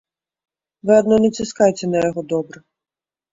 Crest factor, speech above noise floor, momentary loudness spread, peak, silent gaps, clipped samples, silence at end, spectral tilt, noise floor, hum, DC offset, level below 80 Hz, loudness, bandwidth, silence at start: 18 dB; over 73 dB; 11 LU; -2 dBFS; none; under 0.1%; 0.85 s; -6 dB/octave; under -90 dBFS; none; under 0.1%; -56 dBFS; -18 LUFS; 7.8 kHz; 0.85 s